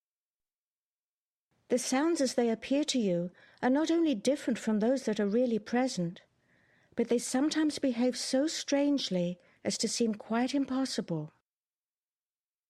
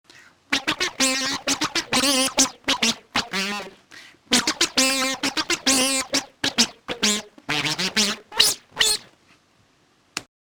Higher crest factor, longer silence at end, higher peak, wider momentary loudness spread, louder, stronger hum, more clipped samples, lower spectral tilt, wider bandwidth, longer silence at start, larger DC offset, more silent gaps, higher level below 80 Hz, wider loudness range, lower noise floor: second, 16 dB vs 22 dB; first, 1.4 s vs 0.3 s; second, -16 dBFS vs -2 dBFS; about the same, 7 LU vs 8 LU; second, -31 LUFS vs -21 LUFS; neither; neither; first, -4.5 dB/octave vs -0.5 dB/octave; second, 13.5 kHz vs over 20 kHz; first, 1.7 s vs 0.5 s; neither; neither; second, -74 dBFS vs -56 dBFS; about the same, 3 LU vs 1 LU; first, under -90 dBFS vs -61 dBFS